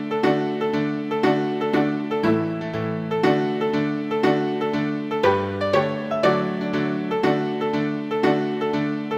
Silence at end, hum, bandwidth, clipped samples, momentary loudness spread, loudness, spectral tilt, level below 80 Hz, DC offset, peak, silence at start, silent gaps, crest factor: 0 s; none; 8.4 kHz; under 0.1%; 4 LU; -22 LUFS; -7 dB/octave; -60 dBFS; under 0.1%; -4 dBFS; 0 s; none; 18 dB